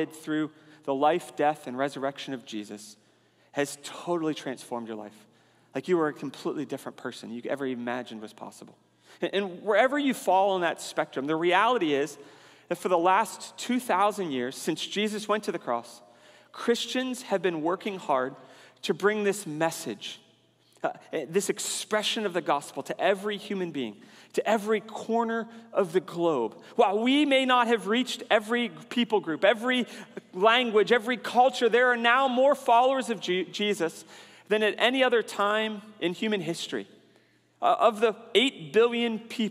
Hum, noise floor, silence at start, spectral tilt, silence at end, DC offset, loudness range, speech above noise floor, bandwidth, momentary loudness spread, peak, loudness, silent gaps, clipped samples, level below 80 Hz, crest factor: none; -63 dBFS; 0 s; -3.5 dB/octave; 0 s; under 0.1%; 9 LU; 36 dB; 15.5 kHz; 14 LU; -6 dBFS; -27 LUFS; none; under 0.1%; -84 dBFS; 22 dB